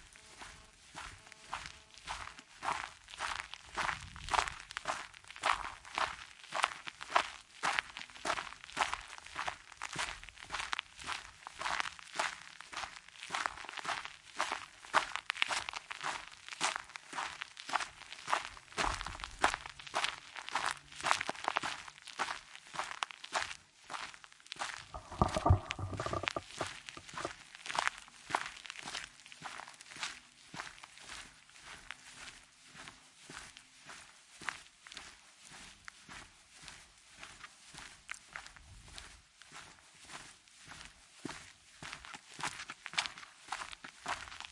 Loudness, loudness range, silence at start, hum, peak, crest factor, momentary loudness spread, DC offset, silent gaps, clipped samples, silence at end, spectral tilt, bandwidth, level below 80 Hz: -39 LUFS; 14 LU; 0 s; none; -8 dBFS; 34 dB; 18 LU; under 0.1%; none; under 0.1%; 0 s; -2.5 dB/octave; 11.5 kHz; -58 dBFS